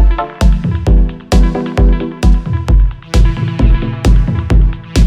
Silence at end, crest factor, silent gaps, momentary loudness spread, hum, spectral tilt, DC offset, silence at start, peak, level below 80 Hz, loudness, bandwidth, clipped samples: 0 s; 10 dB; none; 2 LU; none; -7 dB/octave; under 0.1%; 0 s; 0 dBFS; -12 dBFS; -13 LUFS; 9.8 kHz; under 0.1%